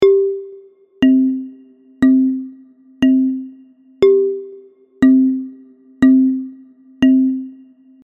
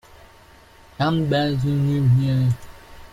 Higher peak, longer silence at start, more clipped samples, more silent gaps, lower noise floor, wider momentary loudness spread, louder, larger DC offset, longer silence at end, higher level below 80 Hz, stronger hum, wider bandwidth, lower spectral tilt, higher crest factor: first, 0 dBFS vs -8 dBFS; second, 0 s vs 1 s; neither; neither; second, -45 dBFS vs -49 dBFS; first, 21 LU vs 6 LU; first, -15 LUFS vs -21 LUFS; neither; first, 0.5 s vs 0.05 s; second, -52 dBFS vs -46 dBFS; neither; second, 6.6 kHz vs 10.5 kHz; about the same, -7 dB/octave vs -8 dB/octave; about the same, 16 dB vs 14 dB